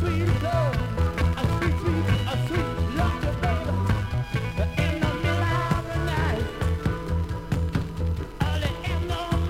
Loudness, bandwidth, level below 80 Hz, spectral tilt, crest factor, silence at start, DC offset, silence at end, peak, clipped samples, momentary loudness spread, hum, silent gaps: -26 LUFS; 15.5 kHz; -34 dBFS; -6.5 dB/octave; 16 dB; 0 s; under 0.1%; 0 s; -8 dBFS; under 0.1%; 4 LU; none; none